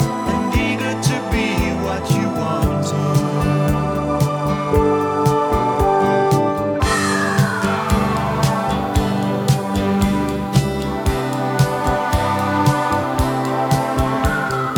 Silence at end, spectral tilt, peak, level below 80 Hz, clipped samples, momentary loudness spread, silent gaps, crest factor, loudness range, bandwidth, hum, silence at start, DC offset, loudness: 0 s; -6 dB/octave; -2 dBFS; -30 dBFS; under 0.1%; 3 LU; none; 16 dB; 2 LU; 20 kHz; none; 0 s; under 0.1%; -18 LUFS